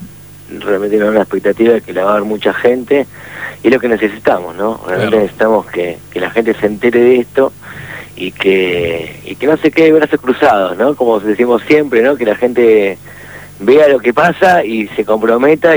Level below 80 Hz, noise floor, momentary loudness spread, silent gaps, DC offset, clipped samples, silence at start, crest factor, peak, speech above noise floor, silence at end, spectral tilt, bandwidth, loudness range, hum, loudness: -48 dBFS; -32 dBFS; 14 LU; none; 0.2%; under 0.1%; 0 s; 12 dB; 0 dBFS; 21 dB; 0 s; -6 dB/octave; over 20 kHz; 3 LU; 50 Hz at -40 dBFS; -12 LUFS